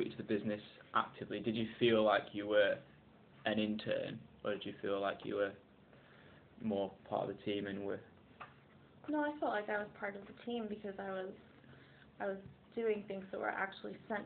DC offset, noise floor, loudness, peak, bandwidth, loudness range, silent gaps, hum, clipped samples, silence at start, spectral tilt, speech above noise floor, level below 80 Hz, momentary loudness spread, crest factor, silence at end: under 0.1%; -63 dBFS; -39 LUFS; -18 dBFS; 4.6 kHz; 8 LU; none; none; under 0.1%; 0 s; -3.5 dB/octave; 24 dB; -74 dBFS; 15 LU; 22 dB; 0 s